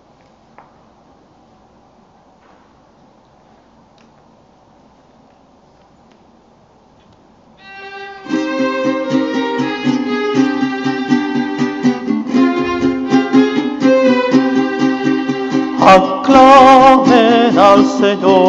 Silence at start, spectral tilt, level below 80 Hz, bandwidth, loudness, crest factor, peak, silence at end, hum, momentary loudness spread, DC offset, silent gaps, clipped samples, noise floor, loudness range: 7.65 s; -5.5 dB/octave; -48 dBFS; 7.8 kHz; -12 LUFS; 14 dB; 0 dBFS; 0 s; none; 12 LU; under 0.1%; none; 0.5%; -48 dBFS; 12 LU